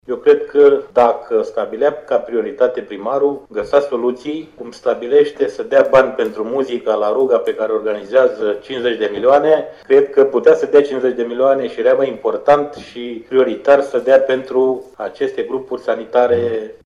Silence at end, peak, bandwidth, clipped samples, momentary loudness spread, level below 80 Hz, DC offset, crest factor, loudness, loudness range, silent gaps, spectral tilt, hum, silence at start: 0.15 s; -2 dBFS; 7.6 kHz; under 0.1%; 10 LU; -56 dBFS; under 0.1%; 14 dB; -15 LUFS; 4 LU; none; -6 dB/octave; none; 0.1 s